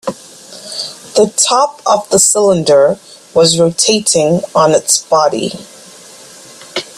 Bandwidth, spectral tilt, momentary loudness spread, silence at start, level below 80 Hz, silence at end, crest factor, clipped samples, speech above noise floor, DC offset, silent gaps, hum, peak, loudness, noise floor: 14.5 kHz; -3 dB/octave; 15 LU; 0.05 s; -52 dBFS; 0.15 s; 12 dB; under 0.1%; 25 dB; under 0.1%; none; none; 0 dBFS; -11 LUFS; -36 dBFS